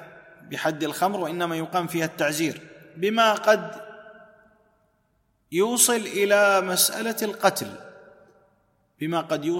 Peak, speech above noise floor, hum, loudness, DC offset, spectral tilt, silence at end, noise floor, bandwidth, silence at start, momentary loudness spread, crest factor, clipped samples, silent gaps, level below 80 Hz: -4 dBFS; 45 dB; none; -23 LUFS; under 0.1%; -3 dB/octave; 0 s; -68 dBFS; 16.5 kHz; 0 s; 16 LU; 22 dB; under 0.1%; none; -72 dBFS